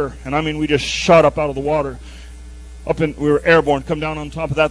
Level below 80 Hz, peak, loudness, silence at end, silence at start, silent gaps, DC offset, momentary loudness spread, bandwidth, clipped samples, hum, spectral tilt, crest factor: -36 dBFS; 0 dBFS; -17 LUFS; 0 s; 0 s; none; under 0.1%; 15 LU; 11 kHz; under 0.1%; none; -5.5 dB/octave; 18 dB